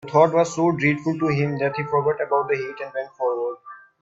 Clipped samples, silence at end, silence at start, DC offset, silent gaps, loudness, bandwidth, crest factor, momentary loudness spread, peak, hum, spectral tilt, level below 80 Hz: under 0.1%; 0.25 s; 0.05 s; under 0.1%; none; -22 LUFS; 8 kHz; 20 dB; 12 LU; -2 dBFS; none; -6.5 dB/octave; -62 dBFS